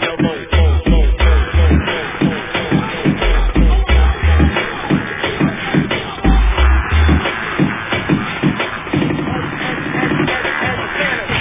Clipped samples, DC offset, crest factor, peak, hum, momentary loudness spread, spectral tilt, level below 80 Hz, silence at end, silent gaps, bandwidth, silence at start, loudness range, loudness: under 0.1%; under 0.1%; 14 dB; 0 dBFS; none; 5 LU; -10 dB/octave; -16 dBFS; 0 s; none; 3.8 kHz; 0 s; 2 LU; -16 LUFS